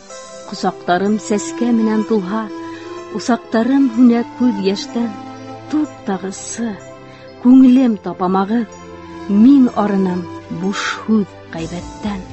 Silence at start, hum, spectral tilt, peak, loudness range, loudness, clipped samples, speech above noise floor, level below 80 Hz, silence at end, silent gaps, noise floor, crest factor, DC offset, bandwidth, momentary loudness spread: 0.1 s; none; -6 dB/octave; -2 dBFS; 5 LU; -16 LUFS; under 0.1%; 22 dB; -48 dBFS; 0 s; none; -36 dBFS; 14 dB; 0.2%; 8.4 kHz; 20 LU